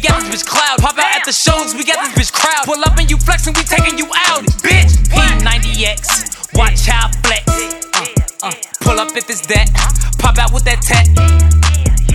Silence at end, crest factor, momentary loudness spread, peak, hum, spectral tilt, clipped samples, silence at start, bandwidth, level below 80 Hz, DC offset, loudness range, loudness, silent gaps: 0 s; 12 dB; 7 LU; 0 dBFS; none; -3.5 dB/octave; under 0.1%; 0 s; 15.5 kHz; -14 dBFS; under 0.1%; 3 LU; -12 LUFS; none